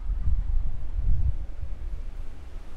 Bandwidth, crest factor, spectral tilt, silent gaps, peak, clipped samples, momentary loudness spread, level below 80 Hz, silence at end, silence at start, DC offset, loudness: 2.9 kHz; 14 dB; -8.5 dB/octave; none; -10 dBFS; under 0.1%; 14 LU; -28 dBFS; 0 s; 0 s; under 0.1%; -33 LUFS